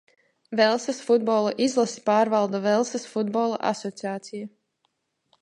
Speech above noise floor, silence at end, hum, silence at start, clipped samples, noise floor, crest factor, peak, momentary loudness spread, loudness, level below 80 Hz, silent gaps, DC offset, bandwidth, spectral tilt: 50 dB; 0.95 s; none; 0.5 s; under 0.1%; -74 dBFS; 18 dB; -6 dBFS; 12 LU; -24 LUFS; -76 dBFS; none; under 0.1%; 11 kHz; -4.5 dB/octave